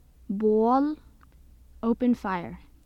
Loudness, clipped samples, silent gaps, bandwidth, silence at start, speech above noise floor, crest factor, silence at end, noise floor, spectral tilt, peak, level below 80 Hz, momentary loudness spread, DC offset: -26 LUFS; under 0.1%; none; 6.8 kHz; 0.3 s; 29 dB; 16 dB; 0.3 s; -53 dBFS; -8.5 dB/octave; -12 dBFS; -52 dBFS; 14 LU; under 0.1%